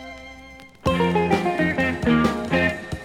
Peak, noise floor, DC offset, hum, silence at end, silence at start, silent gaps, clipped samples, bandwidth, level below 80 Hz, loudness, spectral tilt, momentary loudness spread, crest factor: -6 dBFS; -44 dBFS; under 0.1%; none; 0 s; 0 s; none; under 0.1%; 14.5 kHz; -42 dBFS; -21 LUFS; -6.5 dB/octave; 19 LU; 18 dB